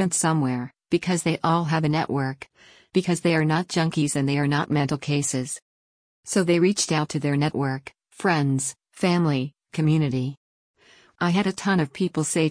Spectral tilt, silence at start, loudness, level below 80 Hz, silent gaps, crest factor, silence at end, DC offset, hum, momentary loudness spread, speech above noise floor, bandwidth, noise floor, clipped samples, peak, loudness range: -5 dB/octave; 0 s; -24 LUFS; -60 dBFS; 5.62-6.23 s, 10.37-10.74 s; 16 dB; 0 s; under 0.1%; none; 8 LU; over 67 dB; 10.5 kHz; under -90 dBFS; under 0.1%; -8 dBFS; 1 LU